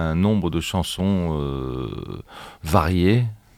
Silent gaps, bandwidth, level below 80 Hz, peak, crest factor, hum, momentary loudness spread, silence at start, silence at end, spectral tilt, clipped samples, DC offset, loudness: none; 16 kHz; -40 dBFS; -2 dBFS; 20 dB; none; 16 LU; 0 s; 0.2 s; -6.5 dB/octave; under 0.1%; under 0.1%; -22 LUFS